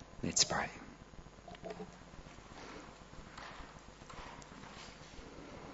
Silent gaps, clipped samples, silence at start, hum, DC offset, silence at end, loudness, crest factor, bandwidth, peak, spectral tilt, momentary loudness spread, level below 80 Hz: none; under 0.1%; 0 s; none; under 0.1%; 0 s; -40 LUFS; 28 dB; 7.6 kHz; -16 dBFS; -2 dB/octave; 22 LU; -60 dBFS